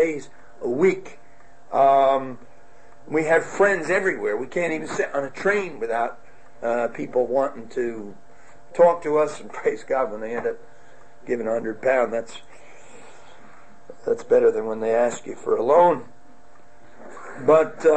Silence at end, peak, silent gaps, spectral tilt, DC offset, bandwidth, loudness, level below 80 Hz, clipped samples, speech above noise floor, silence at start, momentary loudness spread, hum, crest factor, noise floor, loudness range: 0 s; -6 dBFS; none; -5.5 dB/octave; 1%; 8.8 kHz; -22 LUFS; -64 dBFS; under 0.1%; 31 dB; 0 s; 15 LU; none; 18 dB; -53 dBFS; 5 LU